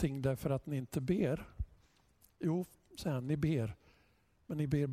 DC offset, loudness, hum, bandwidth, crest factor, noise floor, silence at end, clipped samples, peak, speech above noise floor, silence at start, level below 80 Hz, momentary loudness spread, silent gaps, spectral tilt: under 0.1%; -38 LUFS; none; 16 kHz; 18 dB; -71 dBFS; 0 s; under 0.1%; -20 dBFS; 36 dB; 0 s; -54 dBFS; 13 LU; none; -8 dB/octave